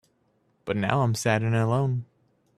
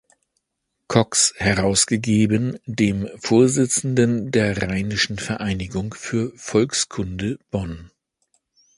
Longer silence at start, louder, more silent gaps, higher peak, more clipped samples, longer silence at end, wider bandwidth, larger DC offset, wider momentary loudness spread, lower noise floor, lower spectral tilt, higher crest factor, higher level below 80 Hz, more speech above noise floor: second, 0.65 s vs 0.9 s; second, -25 LUFS vs -20 LUFS; neither; second, -4 dBFS vs 0 dBFS; neither; second, 0.55 s vs 0.9 s; first, 13.5 kHz vs 11.5 kHz; neither; about the same, 9 LU vs 10 LU; second, -68 dBFS vs -77 dBFS; first, -6 dB/octave vs -4 dB/octave; about the same, 22 dB vs 20 dB; second, -60 dBFS vs -44 dBFS; second, 44 dB vs 57 dB